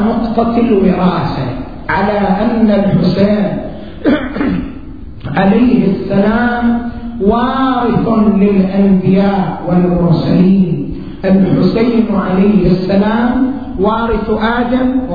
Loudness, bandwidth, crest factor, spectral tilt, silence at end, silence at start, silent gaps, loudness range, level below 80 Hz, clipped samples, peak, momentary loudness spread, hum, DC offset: -12 LUFS; 5 kHz; 12 dB; -10 dB/octave; 0 s; 0 s; none; 2 LU; -30 dBFS; under 0.1%; 0 dBFS; 8 LU; none; 2%